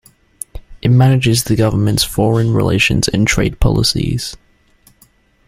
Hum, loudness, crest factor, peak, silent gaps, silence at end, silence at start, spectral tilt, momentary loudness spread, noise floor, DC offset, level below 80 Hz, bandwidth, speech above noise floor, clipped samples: none; -14 LUFS; 14 dB; 0 dBFS; none; 1.1 s; 0.55 s; -5 dB/octave; 15 LU; -52 dBFS; under 0.1%; -28 dBFS; 15.5 kHz; 39 dB; under 0.1%